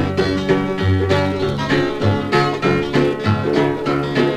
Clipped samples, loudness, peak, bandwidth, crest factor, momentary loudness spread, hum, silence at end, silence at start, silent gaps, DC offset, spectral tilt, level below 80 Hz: under 0.1%; -18 LUFS; -2 dBFS; 12 kHz; 14 dB; 2 LU; none; 0 s; 0 s; none; under 0.1%; -7 dB/octave; -42 dBFS